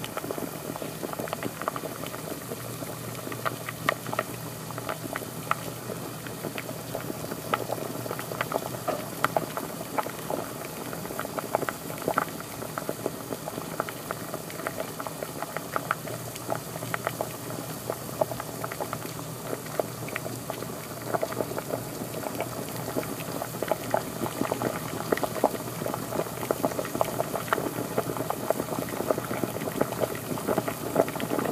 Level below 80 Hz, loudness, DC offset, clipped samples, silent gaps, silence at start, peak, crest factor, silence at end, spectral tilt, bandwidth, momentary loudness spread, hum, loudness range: -60 dBFS; -32 LUFS; under 0.1%; under 0.1%; none; 0 s; -2 dBFS; 28 dB; 0 s; -4.5 dB/octave; 15.5 kHz; 7 LU; none; 4 LU